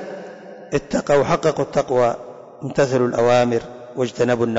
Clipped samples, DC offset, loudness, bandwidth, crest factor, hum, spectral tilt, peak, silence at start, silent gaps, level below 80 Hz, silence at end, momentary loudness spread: under 0.1%; under 0.1%; -19 LUFS; 8 kHz; 12 dB; none; -6 dB/octave; -8 dBFS; 0 s; none; -50 dBFS; 0 s; 17 LU